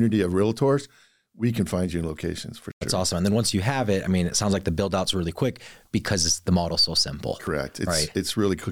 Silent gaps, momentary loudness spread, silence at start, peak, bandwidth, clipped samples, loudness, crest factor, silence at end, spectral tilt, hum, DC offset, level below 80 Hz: 2.73-2.81 s; 9 LU; 0 s; -10 dBFS; 17.5 kHz; under 0.1%; -24 LUFS; 14 dB; 0 s; -4.5 dB/octave; none; 0.3%; -46 dBFS